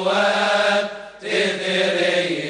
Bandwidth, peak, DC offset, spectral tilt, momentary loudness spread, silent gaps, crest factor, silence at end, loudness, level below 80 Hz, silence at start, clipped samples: 10 kHz; -6 dBFS; under 0.1%; -3.5 dB/octave; 6 LU; none; 14 dB; 0 s; -19 LUFS; -64 dBFS; 0 s; under 0.1%